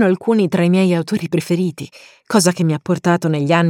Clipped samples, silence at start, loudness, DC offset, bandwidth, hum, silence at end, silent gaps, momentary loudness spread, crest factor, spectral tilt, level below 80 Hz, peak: under 0.1%; 0 s; -17 LUFS; under 0.1%; 16 kHz; none; 0 s; none; 6 LU; 14 dB; -6 dB/octave; -64 dBFS; 0 dBFS